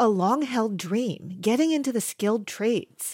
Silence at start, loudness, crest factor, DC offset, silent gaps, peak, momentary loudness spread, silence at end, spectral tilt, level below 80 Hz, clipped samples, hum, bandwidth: 0 s; -25 LUFS; 14 dB; under 0.1%; none; -10 dBFS; 5 LU; 0 s; -5 dB/octave; -82 dBFS; under 0.1%; none; 17 kHz